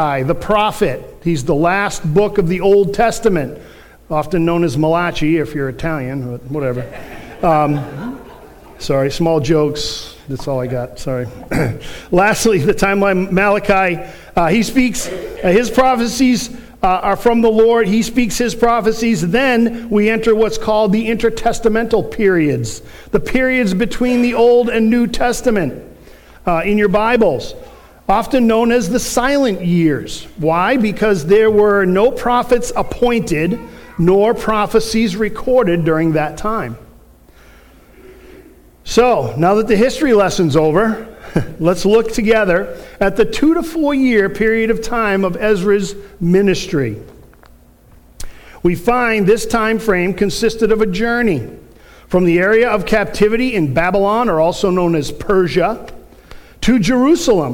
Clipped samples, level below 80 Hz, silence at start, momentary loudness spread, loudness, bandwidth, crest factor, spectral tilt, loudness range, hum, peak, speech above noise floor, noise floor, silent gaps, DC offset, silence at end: under 0.1%; -34 dBFS; 0 s; 10 LU; -15 LUFS; 18.5 kHz; 14 dB; -5.5 dB/octave; 4 LU; none; 0 dBFS; 31 dB; -45 dBFS; none; under 0.1%; 0 s